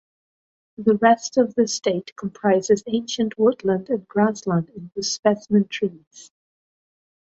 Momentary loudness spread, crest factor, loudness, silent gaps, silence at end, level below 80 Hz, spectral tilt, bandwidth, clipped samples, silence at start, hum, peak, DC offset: 9 LU; 20 dB; -21 LUFS; 2.12-2.16 s, 5.19-5.23 s, 6.07-6.11 s; 1 s; -64 dBFS; -5 dB/octave; 8 kHz; under 0.1%; 0.8 s; none; -4 dBFS; under 0.1%